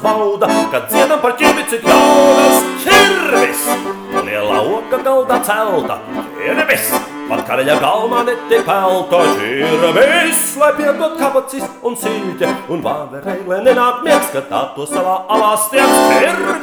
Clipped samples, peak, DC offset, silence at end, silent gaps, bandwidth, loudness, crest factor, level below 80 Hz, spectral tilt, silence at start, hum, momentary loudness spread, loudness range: under 0.1%; 0 dBFS; under 0.1%; 0 s; none; over 20 kHz; -13 LUFS; 12 dB; -52 dBFS; -3 dB/octave; 0 s; none; 10 LU; 6 LU